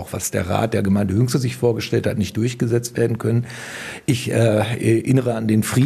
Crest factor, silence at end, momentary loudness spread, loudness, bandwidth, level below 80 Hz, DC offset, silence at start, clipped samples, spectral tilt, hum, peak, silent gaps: 16 dB; 0 s; 6 LU; -20 LUFS; 14 kHz; -54 dBFS; under 0.1%; 0 s; under 0.1%; -6 dB/octave; none; -2 dBFS; none